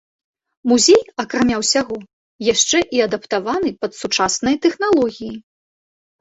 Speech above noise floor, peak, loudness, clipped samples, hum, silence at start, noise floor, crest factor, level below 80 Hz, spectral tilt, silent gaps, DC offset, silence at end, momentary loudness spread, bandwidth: over 73 dB; -2 dBFS; -17 LUFS; under 0.1%; none; 0.65 s; under -90 dBFS; 16 dB; -52 dBFS; -2.5 dB/octave; 2.13-2.39 s; under 0.1%; 0.8 s; 13 LU; 8.2 kHz